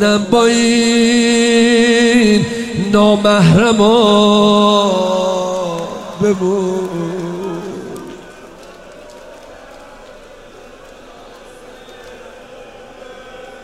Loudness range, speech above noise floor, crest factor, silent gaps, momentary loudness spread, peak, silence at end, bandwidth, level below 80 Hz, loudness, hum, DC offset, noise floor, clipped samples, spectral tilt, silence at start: 17 LU; 26 dB; 14 dB; none; 18 LU; 0 dBFS; 0 s; 13 kHz; -44 dBFS; -12 LUFS; none; under 0.1%; -37 dBFS; under 0.1%; -5 dB/octave; 0 s